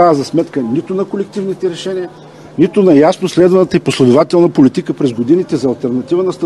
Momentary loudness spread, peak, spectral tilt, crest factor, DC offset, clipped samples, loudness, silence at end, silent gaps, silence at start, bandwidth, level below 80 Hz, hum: 10 LU; 0 dBFS; -7 dB/octave; 12 dB; 0.1%; 0.2%; -12 LUFS; 0 s; none; 0 s; 12 kHz; -52 dBFS; none